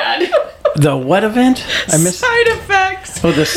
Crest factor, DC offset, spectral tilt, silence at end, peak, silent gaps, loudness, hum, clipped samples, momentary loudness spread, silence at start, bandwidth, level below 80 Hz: 12 dB; under 0.1%; -4 dB/octave; 0 s; 0 dBFS; none; -13 LUFS; none; under 0.1%; 4 LU; 0 s; 17 kHz; -40 dBFS